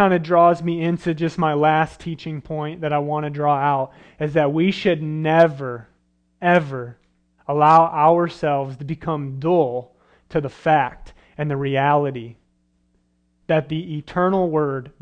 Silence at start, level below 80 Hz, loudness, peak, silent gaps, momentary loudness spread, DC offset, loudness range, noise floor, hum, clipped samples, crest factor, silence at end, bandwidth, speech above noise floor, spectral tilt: 0 s; -54 dBFS; -20 LUFS; -2 dBFS; none; 14 LU; under 0.1%; 4 LU; -64 dBFS; none; under 0.1%; 18 dB; 0.15 s; 9.2 kHz; 45 dB; -8 dB/octave